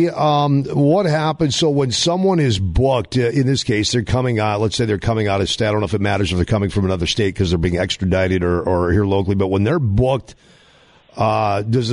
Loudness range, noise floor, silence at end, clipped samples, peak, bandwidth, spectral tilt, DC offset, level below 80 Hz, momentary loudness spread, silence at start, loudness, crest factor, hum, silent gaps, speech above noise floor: 2 LU; -50 dBFS; 0 s; under 0.1%; -6 dBFS; 11 kHz; -5.5 dB/octave; under 0.1%; -34 dBFS; 3 LU; 0 s; -17 LUFS; 12 dB; none; none; 33 dB